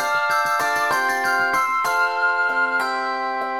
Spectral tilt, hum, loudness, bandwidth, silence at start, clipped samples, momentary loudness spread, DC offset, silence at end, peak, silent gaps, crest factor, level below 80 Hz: -1.5 dB/octave; none; -20 LUFS; 18 kHz; 0 s; under 0.1%; 4 LU; 0.3%; 0 s; -8 dBFS; none; 12 dB; -64 dBFS